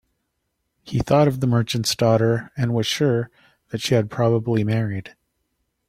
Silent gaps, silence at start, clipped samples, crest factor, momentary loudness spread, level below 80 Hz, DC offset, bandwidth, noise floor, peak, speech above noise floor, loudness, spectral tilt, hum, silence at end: none; 0.85 s; under 0.1%; 18 dB; 10 LU; -50 dBFS; under 0.1%; 15 kHz; -75 dBFS; -4 dBFS; 55 dB; -21 LUFS; -6 dB/octave; none; 0.8 s